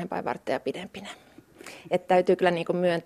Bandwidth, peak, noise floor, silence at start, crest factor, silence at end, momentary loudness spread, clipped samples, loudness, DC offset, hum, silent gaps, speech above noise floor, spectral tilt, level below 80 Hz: 14 kHz; -8 dBFS; -47 dBFS; 0 s; 20 dB; 0.05 s; 22 LU; under 0.1%; -26 LUFS; under 0.1%; none; none; 21 dB; -6 dB/octave; -68 dBFS